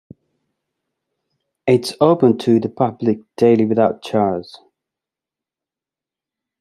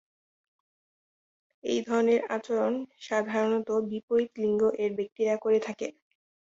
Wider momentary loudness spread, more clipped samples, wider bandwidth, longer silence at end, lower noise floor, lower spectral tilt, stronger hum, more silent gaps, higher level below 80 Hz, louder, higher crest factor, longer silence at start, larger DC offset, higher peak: about the same, 7 LU vs 8 LU; neither; first, 13 kHz vs 7.8 kHz; first, 2.05 s vs 0.65 s; about the same, -88 dBFS vs under -90 dBFS; first, -7 dB/octave vs -5.5 dB/octave; neither; second, none vs 4.03-4.08 s, 5.12-5.16 s; first, -64 dBFS vs -72 dBFS; first, -17 LUFS vs -28 LUFS; about the same, 18 dB vs 16 dB; about the same, 1.65 s vs 1.65 s; neither; first, -2 dBFS vs -14 dBFS